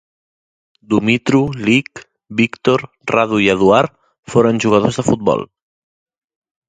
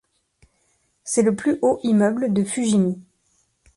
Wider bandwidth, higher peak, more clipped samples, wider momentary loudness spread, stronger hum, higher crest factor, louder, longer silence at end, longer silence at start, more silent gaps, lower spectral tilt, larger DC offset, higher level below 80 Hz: second, 9.4 kHz vs 11.5 kHz; first, 0 dBFS vs -6 dBFS; neither; about the same, 7 LU vs 6 LU; neither; about the same, 16 dB vs 16 dB; first, -15 LUFS vs -20 LUFS; first, 1.25 s vs 0.75 s; second, 0.9 s vs 1.05 s; first, 4.19-4.23 s vs none; about the same, -6 dB/octave vs -6 dB/octave; neither; first, -48 dBFS vs -60 dBFS